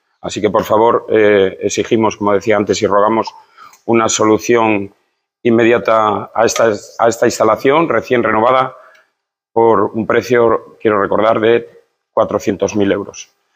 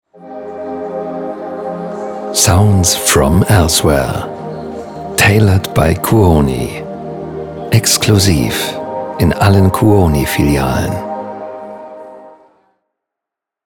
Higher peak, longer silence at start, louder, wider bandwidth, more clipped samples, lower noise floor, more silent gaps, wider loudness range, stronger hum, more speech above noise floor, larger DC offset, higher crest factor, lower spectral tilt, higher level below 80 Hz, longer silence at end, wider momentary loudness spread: about the same, 0 dBFS vs 0 dBFS; about the same, 0.25 s vs 0.2 s; about the same, -13 LUFS vs -12 LUFS; second, 16 kHz vs 19.5 kHz; neither; second, -69 dBFS vs -83 dBFS; neither; second, 1 LU vs 4 LU; neither; second, 57 dB vs 72 dB; neither; about the same, 14 dB vs 14 dB; about the same, -4.5 dB/octave vs -4.5 dB/octave; second, -54 dBFS vs -30 dBFS; second, 0.35 s vs 1.35 s; second, 7 LU vs 16 LU